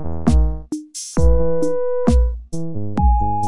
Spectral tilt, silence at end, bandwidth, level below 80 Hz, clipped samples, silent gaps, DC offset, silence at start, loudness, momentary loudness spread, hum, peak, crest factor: -7.5 dB/octave; 0 s; 11.5 kHz; -20 dBFS; under 0.1%; none; 7%; 0 s; -20 LUFS; 11 LU; none; -2 dBFS; 14 dB